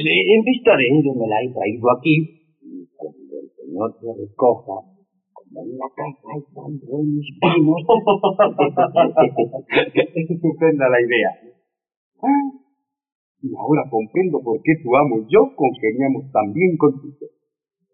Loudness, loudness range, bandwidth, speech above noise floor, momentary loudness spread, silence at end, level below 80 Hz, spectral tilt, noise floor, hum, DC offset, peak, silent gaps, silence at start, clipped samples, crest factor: -18 LUFS; 9 LU; 4.1 kHz; 58 dB; 18 LU; 0.65 s; -64 dBFS; -4.5 dB/octave; -76 dBFS; none; under 0.1%; -4 dBFS; 11.97-12.12 s, 13.15-13.35 s; 0 s; under 0.1%; 16 dB